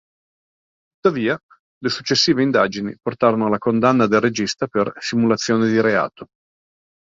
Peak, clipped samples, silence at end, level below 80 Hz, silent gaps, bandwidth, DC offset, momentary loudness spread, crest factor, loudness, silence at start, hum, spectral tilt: -2 dBFS; under 0.1%; 0.9 s; -58 dBFS; 1.43-1.49 s, 1.59-1.81 s; 7.8 kHz; under 0.1%; 9 LU; 18 dB; -19 LUFS; 1.05 s; none; -5 dB/octave